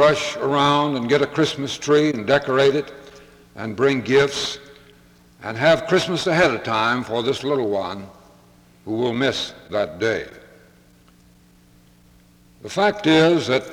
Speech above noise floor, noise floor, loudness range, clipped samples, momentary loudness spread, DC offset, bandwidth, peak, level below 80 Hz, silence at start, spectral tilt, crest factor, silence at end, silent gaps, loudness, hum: 33 dB; -52 dBFS; 7 LU; under 0.1%; 14 LU; under 0.1%; 15 kHz; -4 dBFS; -54 dBFS; 0 s; -5 dB/octave; 18 dB; 0 s; none; -20 LUFS; none